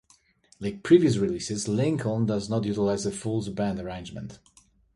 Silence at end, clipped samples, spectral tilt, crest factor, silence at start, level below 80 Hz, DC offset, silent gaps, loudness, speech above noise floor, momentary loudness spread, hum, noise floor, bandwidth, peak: 0.6 s; under 0.1%; -6 dB/octave; 20 dB; 0.6 s; -54 dBFS; under 0.1%; none; -26 LUFS; 35 dB; 16 LU; none; -61 dBFS; 11.5 kHz; -6 dBFS